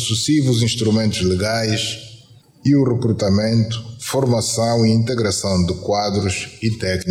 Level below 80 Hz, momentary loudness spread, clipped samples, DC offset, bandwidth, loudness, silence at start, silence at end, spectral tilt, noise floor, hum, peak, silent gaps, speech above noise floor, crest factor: -50 dBFS; 7 LU; under 0.1%; under 0.1%; 15.5 kHz; -18 LUFS; 0 s; 0 s; -5 dB/octave; -46 dBFS; none; -4 dBFS; none; 29 dB; 14 dB